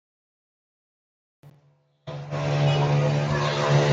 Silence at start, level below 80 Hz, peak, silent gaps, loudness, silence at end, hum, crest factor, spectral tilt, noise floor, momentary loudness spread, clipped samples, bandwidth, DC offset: 1.45 s; -54 dBFS; -8 dBFS; none; -23 LUFS; 0 s; none; 18 dB; -6.5 dB/octave; -62 dBFS; 17 LU; under 0.1%; 7.6 kHz; under 0.1%